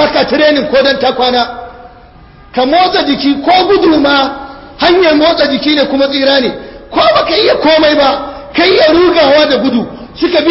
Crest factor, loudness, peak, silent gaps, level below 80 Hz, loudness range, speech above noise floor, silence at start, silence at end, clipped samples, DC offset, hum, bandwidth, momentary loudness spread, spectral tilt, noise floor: 10 dB; -9 LUFS; 0 dBFS; none; -40 dBFS; 3 LU; 28 dB; 0 s; 0 s; under 0.1%; under 0.1%; none; 5.8 kHz; 10 LU; -6.5 dB/octave; -36 dBFS